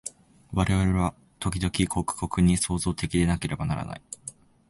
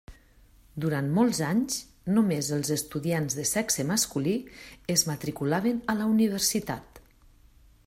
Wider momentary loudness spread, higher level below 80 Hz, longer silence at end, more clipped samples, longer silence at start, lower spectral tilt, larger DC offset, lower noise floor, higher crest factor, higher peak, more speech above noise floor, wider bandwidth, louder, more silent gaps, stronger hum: first, 15 LU vs 8 LU; first, -38 dBFS vs -56 dBFS; second, 0.4 s vs 0.85 s; neither; about the same, 0.05 s vs 0.1 s; first, -5.5 dB/octave vs -4 dB/octave; neither; second, -46 dBFS vs -57 dBFS; about the same, 18 dB vs 20 dB; about the same, -10 dBFS vs -8 dBFS; second, 21 dB vs 30 dB; second, 11.5 kHz vs 16 kHz; about the same, -26 LUFS vs -27 LUFS; neither; neither